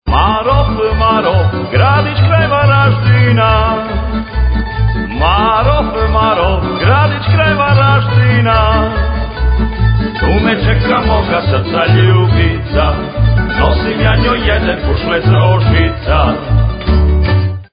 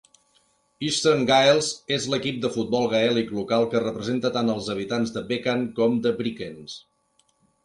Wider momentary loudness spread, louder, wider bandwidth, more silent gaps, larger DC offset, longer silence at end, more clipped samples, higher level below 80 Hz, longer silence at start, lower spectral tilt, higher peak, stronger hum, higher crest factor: second, 6 LU vs 11 LU; first, -11 LUFS vs -23 LUFS; second, 5.2 kHz vs 11.5 kHz; neither; neither; second, 0.1 s vs 0.85 s; neither; first, -16 dBFS vs -62 dBFS; second, 0.05 s vs 0.8 s; first, -10.5 dB/octave vs -4.5 dB/octave; first, 0 dBFS vs -6 dBFS; neither; second, 10 dB vs 20 dB